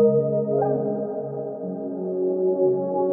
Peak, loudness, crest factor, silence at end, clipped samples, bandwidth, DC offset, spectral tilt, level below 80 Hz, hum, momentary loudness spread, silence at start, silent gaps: -8 dBFS; -24 LUFS; 14 dB; 0 s; under 0.1%; 2 kHz; under 0.1%; -15 dB/octave; -72 dBFS; none; 9 LU; 0 s; none